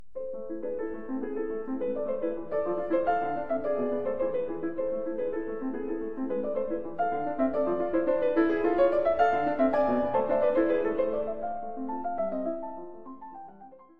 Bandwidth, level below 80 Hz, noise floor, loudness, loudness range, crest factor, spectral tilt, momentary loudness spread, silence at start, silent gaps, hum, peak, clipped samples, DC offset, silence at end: 5.4 kHz; -58 dBFS; -51 dBFS; -29 LUFS; 6 LU; 18 dB; -8.5 dB/octave; 11 LU; 0.15 s; none; none; -12 dBFS; under 0.1%; 1%; 0 s